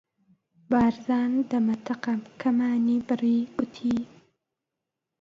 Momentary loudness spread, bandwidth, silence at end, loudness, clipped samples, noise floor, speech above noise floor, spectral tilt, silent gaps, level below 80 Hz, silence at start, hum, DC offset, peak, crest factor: 7 LU; 7 kHz; 1.15 s; -26 LUFS; under 0.1%; -86 dBFS; 61 dB; -7 dB/octave; none; -60 dBFS; 0.7 s; none; under 0.1%; -10 dBFS; 16 dB